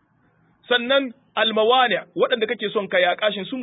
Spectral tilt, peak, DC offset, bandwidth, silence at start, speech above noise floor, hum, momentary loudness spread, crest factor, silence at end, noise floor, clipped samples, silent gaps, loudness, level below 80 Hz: -8.5 dB/octave; -6 dBFS; under 0.1%; 4 kHz; 0.7 s; 41 dB; none; 6 LU; 16 dB; 0 s; -61 dBFS; under 0.1%; none; -20 LUFS; -74 dBFS